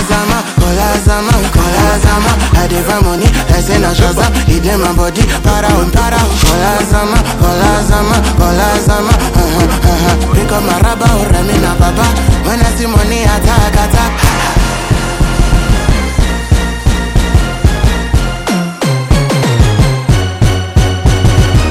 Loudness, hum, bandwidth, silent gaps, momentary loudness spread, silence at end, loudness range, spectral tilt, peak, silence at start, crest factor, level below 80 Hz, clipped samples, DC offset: -11 LUFS; none; 16.5 kHz; none; 3 LU; 0 s; 2 LU; -5 dB/octave; 0 dBFS; 0 s; 10 dB; -14 dBFS; 2%; under 0.1%